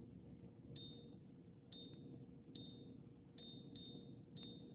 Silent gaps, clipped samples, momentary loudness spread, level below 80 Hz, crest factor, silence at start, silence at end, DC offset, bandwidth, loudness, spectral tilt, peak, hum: none; under 0.1%; 5 LU; -76 dBFS; 16 dB; 0 s; 0 s; under 0.1%; 4 kHz; -58 LUFS; -6 dB/octave; -42 dBFS; none